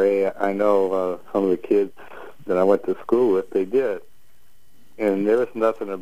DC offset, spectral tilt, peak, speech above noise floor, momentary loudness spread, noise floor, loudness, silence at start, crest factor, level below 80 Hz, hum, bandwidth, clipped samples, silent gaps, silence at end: 1%; -7.5 dB/octave; -4 dBFS; 40 dB; 8 LU; -60 dBFS; -21 LUFS; 0 s; 16 dB; -66 dBFS; none; 15 kHz; under 0.1%; none; 0 s